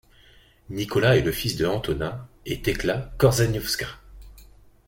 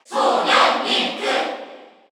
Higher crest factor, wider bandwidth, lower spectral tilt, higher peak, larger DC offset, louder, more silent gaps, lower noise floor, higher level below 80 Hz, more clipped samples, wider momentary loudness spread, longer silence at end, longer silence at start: about the same, 20 dB vs 18 dB; second, 17 kHz vs over 20 kHz; first, -5 dB/octave vs -1.5 dB/octave; about the same, -4 dBFS vs -2 dBFS; neither; second, -24 LUFS vs -18 LUFS; neither; first, -54 dBFS vs -40 dBFS; first, -42 dBFS vs -84 dBFS; neither; first, 13 LU vs 10 LU; first, 0.45 s vs 0.25 s; first, 0.7 s vs 0.1 s